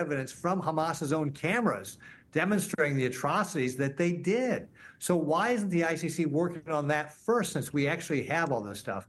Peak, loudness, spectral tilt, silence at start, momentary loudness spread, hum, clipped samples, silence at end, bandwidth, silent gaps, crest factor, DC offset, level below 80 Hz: -12 dBFS; -30 LUFS; -5.5 dB/octave; 0 s; 5 LU; none; under 0.1%; 0.05 s; 12.5 kHz; none; 18 dB; under 0.1%; -68 dBFS